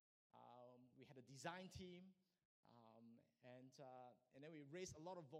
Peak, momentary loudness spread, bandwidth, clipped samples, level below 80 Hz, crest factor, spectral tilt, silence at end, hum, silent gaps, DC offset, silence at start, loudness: -36 dBFS; 13 LU; 12.5 kHz; under 0.1%; -82 dBFS; 26 dB; -4.5 dB/octave; 0 s; none; 2.45-2.63 s; under 0.1%; 0.35 s; -61 LUFS